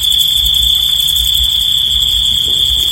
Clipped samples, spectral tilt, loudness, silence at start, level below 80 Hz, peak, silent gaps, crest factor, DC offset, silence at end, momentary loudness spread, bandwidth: under 0.1%; 0 dB/octave; -9 LUFS; 0 s; -26 dBFS; 0 dBFS; none; 12 dB; under 0.1%; 0 s; 1 LU; 17 kHz